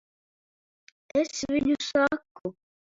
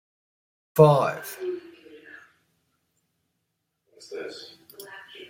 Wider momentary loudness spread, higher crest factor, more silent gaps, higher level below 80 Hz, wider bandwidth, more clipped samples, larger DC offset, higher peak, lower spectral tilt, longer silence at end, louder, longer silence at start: second, 14 LU vs 25 LU; second, 18 dB vs 24 dB; first, 2.31-2.35 s vs none; first, -60 dBFS vs -66 dBFS; second, 7.8 kHz vs 16.5 kHz; neither; neither; second, -10 dBFS vs -4 dBFS; second, -4 dB/octave vs -7 dB/octave; first, 0.4 s vs 0.05 s; second, -27 LUFS vs -22 LUFS; first, 1.15 s vs 0.75 s